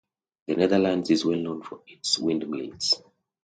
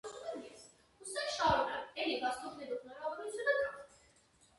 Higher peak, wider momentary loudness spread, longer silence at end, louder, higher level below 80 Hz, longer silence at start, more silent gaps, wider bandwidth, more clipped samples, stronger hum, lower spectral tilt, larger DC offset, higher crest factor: first, -8 dBFS vs -20 dBFS; second, 12 LU vs 17 LU; second, 0.45 s vs 0.75 s; first, -25 LUFS vs -37 LUFS; about the same, -62 dBFS vs -64 dBFS; first, 0.5 s vs 0.05 s; neither; second, 9.4 kHz vs 11.5 kHz; neither; neither; about the same, -4 dB/octave vs -3 dB/octave; neither; about the same, 20 dB vs 20 dB